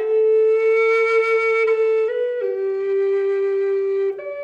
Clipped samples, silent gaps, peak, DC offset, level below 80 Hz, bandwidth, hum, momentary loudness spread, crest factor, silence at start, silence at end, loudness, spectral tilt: under 0.1%; none; -8 dBFS; under 0.1%; -74 dBFS; 7.4 kHz; none; 6 LU; 10 dB; 0 s; 0 s; -19 LUFS; -3.5 dB/octave